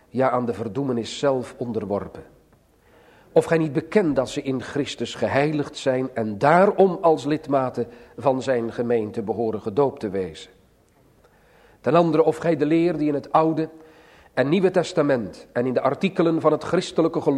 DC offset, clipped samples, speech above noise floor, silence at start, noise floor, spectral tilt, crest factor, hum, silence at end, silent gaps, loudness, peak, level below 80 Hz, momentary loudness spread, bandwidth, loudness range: under 0.1%; under 0.1%; 36 dB; 0.15 s; -58 dBFS; -6.5 dB/octave; 20 dB; none; 0 s; none; -22 LUFS; -2 dBFS; -58 dBFS; 10 LU; 12 kHz; 5 LU